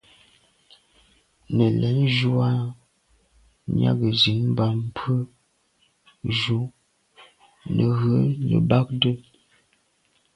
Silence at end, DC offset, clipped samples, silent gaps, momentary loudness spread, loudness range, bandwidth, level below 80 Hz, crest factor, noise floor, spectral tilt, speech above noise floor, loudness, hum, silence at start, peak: 1.15 s; under 0.1%; under 0.1%; none; 14 LU; 4 LU; 9.2 kHz; -52 dBFS; 20 dB; -66 dBFS; -7.5 dB/octave; 45 dB; -22 LUFS; none; 1.5 s; -4 dBFS